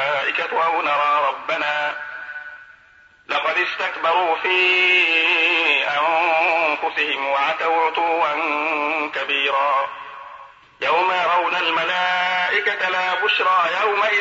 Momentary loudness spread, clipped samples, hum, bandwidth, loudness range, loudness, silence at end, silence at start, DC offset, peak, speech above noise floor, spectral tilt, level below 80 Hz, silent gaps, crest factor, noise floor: 10 LU; under 0.1%; none; 8 kHz; 6 LU; -18 LUFS; 0 s; 0 s; under 0.1%; -6 dBFS; 32 dB; -2.5 dB/octave; -70 dBFS; none; 14 dB; -51 dBFS